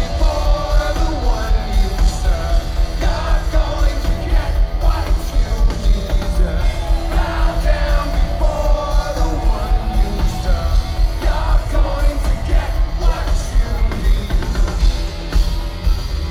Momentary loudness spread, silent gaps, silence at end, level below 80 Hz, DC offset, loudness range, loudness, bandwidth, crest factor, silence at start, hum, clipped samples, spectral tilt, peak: 3 LU; none; 0 s; -16 dBFS; under 0.1%; 1 LU; -20 LUFS; 13 kHz; 12 dB; 0 s; none; under 0.1%; -5.5 dB/octave; -4 dBFS